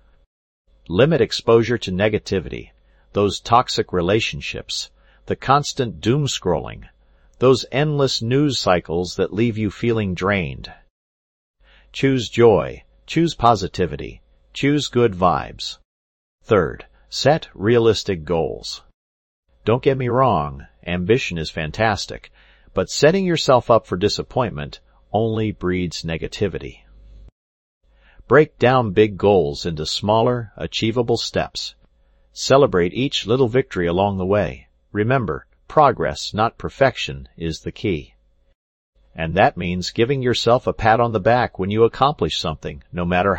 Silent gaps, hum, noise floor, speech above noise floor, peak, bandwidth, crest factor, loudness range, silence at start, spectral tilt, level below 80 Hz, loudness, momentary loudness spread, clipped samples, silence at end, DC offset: 10.90-11.54 s, 15.85-16.38 s, 18.94-19.43 s, 27.32-27.81 s, 38.55-38.93 s; none; -56 dBFS; 38 dB; 0 dBFS; 16.5 kHz; 20 dB; 4 LU; 0.9 s; -5.5 dB/octave; -44 dBFS; -19 LUFS; 13 LU; under 0.1%; 0 s; under 0.1%